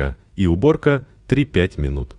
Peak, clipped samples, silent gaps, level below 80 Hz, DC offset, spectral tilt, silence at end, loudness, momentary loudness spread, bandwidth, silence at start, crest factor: -4 dBFS; under 0.1%; none; -32 dBFS; under 0.1%; -8 dB/octave; 0.05 s; -19 LUFS; 8 LU; 10 kHz; 0 s; 16 dB